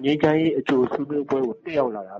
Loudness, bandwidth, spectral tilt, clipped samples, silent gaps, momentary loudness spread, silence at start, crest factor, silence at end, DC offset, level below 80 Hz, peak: -22 LUFS; 7.6 kHz; -7.5 dB/octave; under 0.1%; none; 6 LU; 0 s; 16 dB; 0 s; under 0.1%; -58 dBFS; -6 dBFS